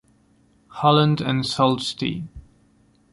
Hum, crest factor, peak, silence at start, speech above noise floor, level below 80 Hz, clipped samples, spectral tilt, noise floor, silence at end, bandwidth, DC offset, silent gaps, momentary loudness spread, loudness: none; 20 dB; -2 dBFS; 0.75 s; 39 dB; -52 dBFS; under 0.1%; -6 dB/octave; -59 dBFS; 0.75 s; 11.5 kHz; under 0.1%; none; 18 LU; -21 LUFS